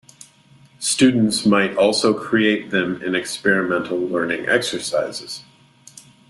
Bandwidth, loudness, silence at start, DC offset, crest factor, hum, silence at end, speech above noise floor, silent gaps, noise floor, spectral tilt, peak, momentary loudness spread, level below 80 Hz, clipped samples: 12.5 kHz; -19 LUFS; 0.8 s; under 0.1%; 18 dB; none; 0.3 s; 32 dB; none; -51 dBFS; -4 dB/octave; -2 dBFS; 8 LU; -60 dBFS; under 0.1%